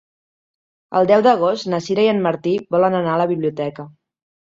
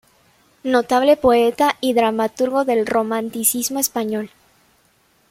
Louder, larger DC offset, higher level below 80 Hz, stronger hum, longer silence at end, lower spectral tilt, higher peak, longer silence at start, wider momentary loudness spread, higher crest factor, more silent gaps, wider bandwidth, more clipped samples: about the same, -18 LUFS vs -18 LUFS; neither; second, -62 dBFS vs -56 dBFS; neither; second, 0.65 s vs 1.05 s; first, -6.5 dB/octave vs -3 dB/octave; about the same, -2 dBFS vs -4 dBFS; first, 0.9 s vs 0.65 s; about the same, 9 LU vs 9 LU; about the same, 16 dB vs 16 dB; neither; second, 7.8 kHz vs 16.5 kHz; neither